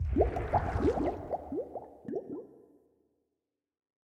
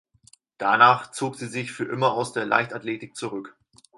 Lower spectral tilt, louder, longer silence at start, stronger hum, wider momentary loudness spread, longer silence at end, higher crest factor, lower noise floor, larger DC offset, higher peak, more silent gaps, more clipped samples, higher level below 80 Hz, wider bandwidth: first, -9 dB/octave vs -4.5 dB/octave; second, -33 LUFS vs -23 LUFS; second, 0 s vs 0.6 s; neither; about the same, 15 LU vs 16 LU; first, 1.5 s vs 0.45 s; about the same, 22 dB vs 22 dB; first, -87 dBFS vs -58 dBFS; neither; second, -12 dBFS vs -2 dBFS; neither; neither; first, -42 dBFS vs -72 dBFS; second, 9.4 kHz vs 11.5 kHz